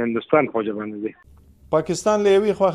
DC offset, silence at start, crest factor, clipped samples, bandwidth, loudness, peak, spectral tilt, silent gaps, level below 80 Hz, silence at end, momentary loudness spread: under 0.1%; 0 s; 18 dB; under 0.1%; 12 kHz; -20 LUFS; -2 dBFS; -5.5 dB/octave; none; -54 dBFS; 0 s; 13 LU